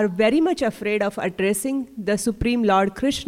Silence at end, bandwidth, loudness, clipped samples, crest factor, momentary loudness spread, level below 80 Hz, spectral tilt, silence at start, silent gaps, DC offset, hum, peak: 0 s; 16.5 kHz; -22 LUFS; under 0.1%; 14 dB; 6 LU; -44 dBFS; -4.5 dB/octave; 0 s; none; under 0.1%; none; -8 dBFS